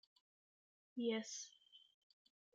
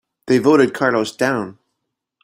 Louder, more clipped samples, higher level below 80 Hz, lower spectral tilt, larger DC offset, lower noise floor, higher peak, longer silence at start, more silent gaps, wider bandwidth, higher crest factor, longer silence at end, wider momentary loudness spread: second, -46 LUFS vs -17 LUFS; neither; second, under -90 dBFS vs -60 dBFS; second, -3 dB/octave vs -5.5 dB/octave; neither; first, under -90 dBFS vs -77 dBFS; second, -30 dBFS vs -2 dBFS; first, 0.95 s vs 0.25 s; neither; second, 9.2 kHz vs 16 kHz; about the same, 20 dB vs 16 dB; about the same, 0.75 s vs 0.7 s; first, 23 LU vs 9 LU